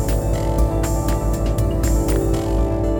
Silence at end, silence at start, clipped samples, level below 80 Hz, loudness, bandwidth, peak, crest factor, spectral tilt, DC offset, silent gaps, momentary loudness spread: 0 s; 0 s; under 0.1%; -20 dBFS; -20 LUFS; 19.5 kHz; -6 dBFS; 12 dB; -6.5 dB/octave; under 0.1%; none; 2 LU